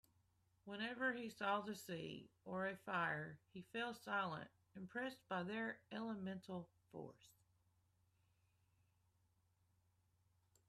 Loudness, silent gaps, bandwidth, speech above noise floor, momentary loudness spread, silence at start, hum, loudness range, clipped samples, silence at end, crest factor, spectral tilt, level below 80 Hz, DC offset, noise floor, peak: -47 LUFS; none; 14 kHz; 34 dB; 14 LU; 0.65 s; none; 13 LU; under 0.1%; 3.4 s; 20 dB; -5.5 dB/octave; -86 dBFS; under 0.1%; -81 dBFS; -30 dBFS